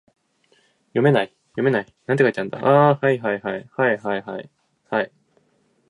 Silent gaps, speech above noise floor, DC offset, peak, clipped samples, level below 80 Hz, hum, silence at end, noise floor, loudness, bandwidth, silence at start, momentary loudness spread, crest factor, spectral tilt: none; 44 dB; under 0.1%; -2 dBFS; under 0.1%; -68 dBFS; none; 0.85 s; -64 dBFS; -21 LUFS; 10.5 kHz; 0.95 s; 13 LU; 20 dB; -8 dB/octave